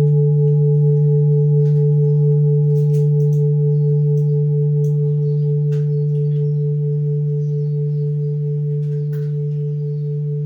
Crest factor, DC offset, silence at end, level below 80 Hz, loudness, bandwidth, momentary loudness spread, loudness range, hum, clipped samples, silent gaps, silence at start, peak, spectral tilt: 8 dB; under 0.1%; 0 s; -66 dBFS; -17 LUFS; 0.9 kHz; 7 LU; 5 LU; none; under 0.1%; none; 0 s; -8 dBFS; -12.5 dB/octave